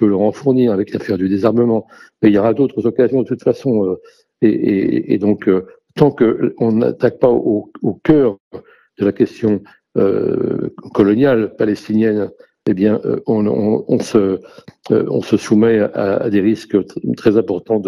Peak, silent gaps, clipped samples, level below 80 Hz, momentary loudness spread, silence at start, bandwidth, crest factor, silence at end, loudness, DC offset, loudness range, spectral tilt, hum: 0 dBFS; 8.40-8.51 s; under 0.1%; -52 dBFS; 7 LU; 0 s; 11.5 kHz; 14 dB; 0 s; -16 LUFS; under 0.1%; 2 LU; -8 dB/octave; none